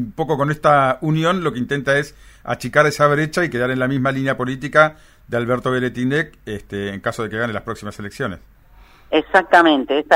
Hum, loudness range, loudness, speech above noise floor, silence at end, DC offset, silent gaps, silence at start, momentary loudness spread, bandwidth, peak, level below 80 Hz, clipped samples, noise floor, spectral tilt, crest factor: none; 6 LU; -18 LUFS; 29 dB; 0 s; under 0.1%; none; 0 s; 13 LU; 16 kHz; 0 dBFS; -48 dBFS; under 0.1%; -47 dBFS; -6 dB/octave; 18 dB